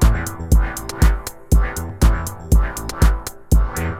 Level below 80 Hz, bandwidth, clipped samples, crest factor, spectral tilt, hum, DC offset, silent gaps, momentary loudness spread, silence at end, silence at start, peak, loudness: -18 dBFS; 16 kHz; under 0.1%; 16 dB; -5.5 dB/octave; none; under 0.1%; none; 7 LU; 0 s; 0 s; -2 dBFS; -20 LUFS